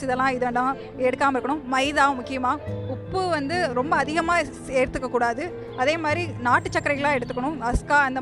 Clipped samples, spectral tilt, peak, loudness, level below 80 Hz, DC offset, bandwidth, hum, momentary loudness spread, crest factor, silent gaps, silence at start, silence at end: under 0.1%; -5 dB/octave; -6 dBFS; -24 LUFS; -42 dBFS; under 0.1%; 12 kHz; none; 6 LU; 18 dB; none; 0 s; 0 s